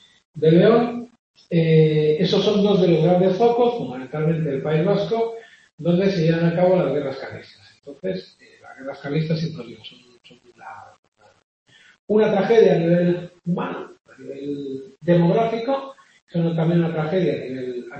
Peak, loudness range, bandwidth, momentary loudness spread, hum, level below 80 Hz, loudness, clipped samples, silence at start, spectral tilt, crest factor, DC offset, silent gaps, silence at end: -4 dBFS; 12 LU; 6.6 kHz; 18 LU; none; -62 dBFS; -20 LUFS; under 0.1%; 0.35 s; -8 dB/octave; 18 dB; under 0.1%; 1.19-1.34 s, 5.73-5.78 s, 10.99-11.12 s, 11.44-11.66 s, 11.99-12.08 s, 14.01-14.05 s, 16.22-16.27 s; 0 s